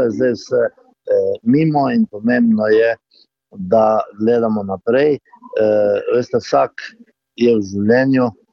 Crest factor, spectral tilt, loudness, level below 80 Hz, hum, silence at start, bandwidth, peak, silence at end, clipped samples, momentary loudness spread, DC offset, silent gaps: 14 dB; -7.5 dB/octave; -16 LUFS; -60 dBFS; none; 0 s; 7 kHz; -2 dBFS; 0.2 s; under 0.1%; 8 LU; under 0.1%; none